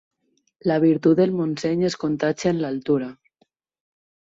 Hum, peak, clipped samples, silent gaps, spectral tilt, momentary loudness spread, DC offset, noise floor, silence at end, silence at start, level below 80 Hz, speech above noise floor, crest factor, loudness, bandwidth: none; -6 dBFS; under 0.1%; none; -7 dB/octave; 7 LU; under 0.1%; -67 dBFS; 1.2 s; 0.65 s; -62 dBFS; 46 dB; 16 dB; -22 LUFS; 7.8 kHz